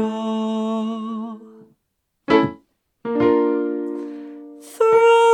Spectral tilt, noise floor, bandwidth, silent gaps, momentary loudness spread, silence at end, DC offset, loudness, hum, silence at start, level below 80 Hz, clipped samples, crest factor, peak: -6 dB/octave; -74 dBFS; 12.5 kHz; none; 22 LU; 0 s; under 0.1%; -20 LUFS; none; 0 s; -60 dBFS; under 0.1%; 16 dB; -4 dBFS